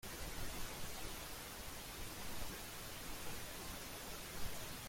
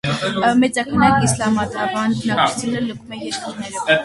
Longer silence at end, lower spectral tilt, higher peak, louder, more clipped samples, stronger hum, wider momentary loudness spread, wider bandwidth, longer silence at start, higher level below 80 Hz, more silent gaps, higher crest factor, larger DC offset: about the same, 0 s vs 0 s; second, -2.5 dB/octave vs -4.5 dB/octave; second, -30 dBFS vs 0 dBFS; second, -48 LUFS vs -18 LUFS; neither; neither; second, 2 LU vs 11 LU; first, 16.5 kHz vs 11.5 kHz; about the same, 0.05 s vs 0.05 s; second, -54 dBFS vs -46 dBFS; neither; about the same, 16 dB vs 18 dB; neither